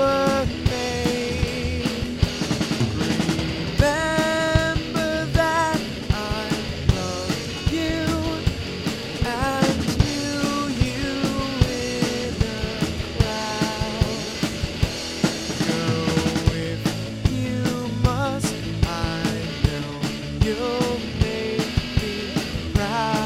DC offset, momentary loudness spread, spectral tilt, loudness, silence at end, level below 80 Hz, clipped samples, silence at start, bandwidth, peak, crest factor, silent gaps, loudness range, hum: under 0.1%; 5 LU; -5 dB/octave; -23 LUFS; 0 s; -32 dBFS; under 0.1%; 0 s; 16.5 kHz; -2 dBFS; 20 dB; none; 3 LU; none